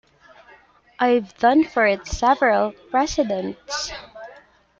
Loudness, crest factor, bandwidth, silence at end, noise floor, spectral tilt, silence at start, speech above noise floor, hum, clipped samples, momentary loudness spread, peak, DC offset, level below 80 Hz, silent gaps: -20 LUFS; 18 dB; 7.8 kHz; 0.45 s; -52 dBFS; -4 dB/octave; 1 s; 32 dB; none; under 0.1%; 12 LU; -4 dBFS; under 0.1%; -44 dBFS; none